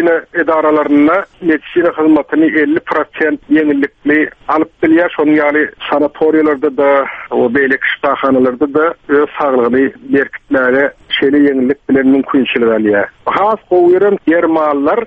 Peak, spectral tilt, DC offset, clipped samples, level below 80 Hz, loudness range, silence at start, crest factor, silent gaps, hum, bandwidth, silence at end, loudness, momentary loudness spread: 0 dBFS; -7.5 dB/octave; under 0.1%; under 0.1%; -50 dBFS; 1 LU; 0 s; 10 dB; none; none; 4.5 kHz; 0 s; -12 LUFS; 5 LU